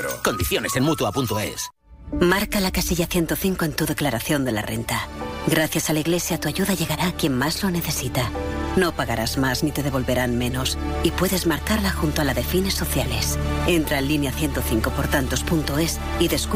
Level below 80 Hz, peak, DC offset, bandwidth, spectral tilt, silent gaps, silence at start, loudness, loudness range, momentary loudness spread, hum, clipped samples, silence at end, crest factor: -32 dBFS; -6 dBFS; under 0.1%; 16 kHz; -4.5 dB/octave; none; 0 s; -22 LUFS; 1 LU; 4 LU; none; under 0.1%; 0 s; 16 dB